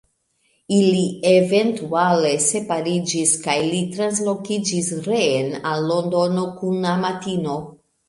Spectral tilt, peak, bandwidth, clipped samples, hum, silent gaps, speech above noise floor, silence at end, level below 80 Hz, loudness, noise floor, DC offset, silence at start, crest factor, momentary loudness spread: -4.5 dB/octave; -4 dBFS; 11.5 kHz; under 0.1%; none; none; 46 dB; 0.4 s; -64 dBFS; -20 LUFS; -66 dBFS; under 0.1%; 0.7 s; 16 dB; 7 LU